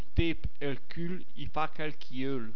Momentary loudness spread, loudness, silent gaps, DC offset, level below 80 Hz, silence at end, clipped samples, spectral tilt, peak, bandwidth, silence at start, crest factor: 8 LU; -36 LUFS; none; 6%; -42 dBFS; 0 s; under 0.1%; -8 dB/octave; -12 dBFS; 5.4 kHz; 0.15 s; 22 dB